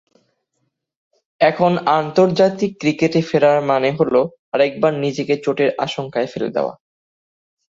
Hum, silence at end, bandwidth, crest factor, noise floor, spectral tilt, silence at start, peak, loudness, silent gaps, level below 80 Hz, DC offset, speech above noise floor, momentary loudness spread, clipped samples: none; 1 s; 7.8 kHz; 18 dB; -72 dBFS; -6.5 dB/octave; 1.4 s; -2 dBFS; -17 LUFS; 4.39-4.52 s; -60 dBFS; under 0.1%; 55 dB; 7 LU; under 0.1%